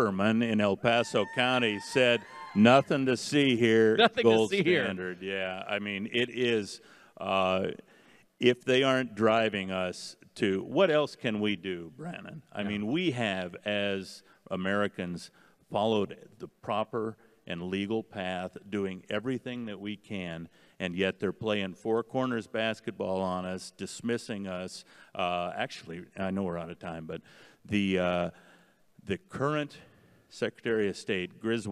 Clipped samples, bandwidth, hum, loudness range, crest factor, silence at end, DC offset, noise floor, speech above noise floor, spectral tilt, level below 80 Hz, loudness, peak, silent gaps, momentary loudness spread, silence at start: under 0.1%; 12.5 kHz; none; 10 LU; 24 dB; 0 s; under 0.1%; -62 dBFS; 32 dB; -5.5 dB/octave; -72 dBFS; -30 LUFS; -6 dBFS; none; 16 LU; 0 s